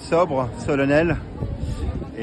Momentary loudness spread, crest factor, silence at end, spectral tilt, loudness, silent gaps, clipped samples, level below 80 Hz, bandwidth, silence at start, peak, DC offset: 11 LU; 16 dB; 0 s; -7 dB/octave; -23 LUFS; none; under 0.1%; -34 dBFS; 11.5 kHz; 0 s; -6 dBFS; under 0.1%